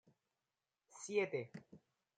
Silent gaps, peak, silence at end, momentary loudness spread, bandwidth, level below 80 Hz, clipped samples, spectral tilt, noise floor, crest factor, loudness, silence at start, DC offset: none; -24 dBFS; 0.4 s; 20 LU; 9.4 kHz; under -90 dBFS; under 0.1%; -4.5 dB/octave; under -90 dBFS; 22 dB; -42 LUFS; 0.9 s; under 0.1%